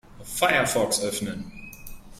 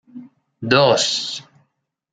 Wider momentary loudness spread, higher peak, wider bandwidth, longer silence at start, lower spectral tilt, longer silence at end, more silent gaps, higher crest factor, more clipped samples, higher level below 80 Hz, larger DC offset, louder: first, 21 LU vs 18 LU; second, -6 dBFS vs 0 dBFS; first, 16 kHz vs 9.4 kHz; about the same, 0.1 s vs 0.15 s; about the same, -2.5 dB/octave vs -3.5 dB/octave; second, 0 s vs 0.7 s; neither; about the same, 22 dB vs 20 dB; neither; first, -48 dBFS vs -62 dBFS; neither; second, -24 LUFS vs -17 LUFS